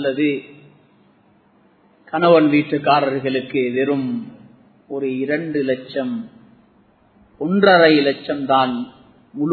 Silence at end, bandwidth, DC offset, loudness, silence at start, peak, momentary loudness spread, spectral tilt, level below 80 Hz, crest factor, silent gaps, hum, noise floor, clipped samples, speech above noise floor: 0 s; 4.6 kHz; under 0.1%; -18 LUFS; 0 s; 0 dBFS; 16 LU; -9 dB/octave; -64 dBFS; 20 dB; none; none; -55 dBFS; under 0.1%; 38 dB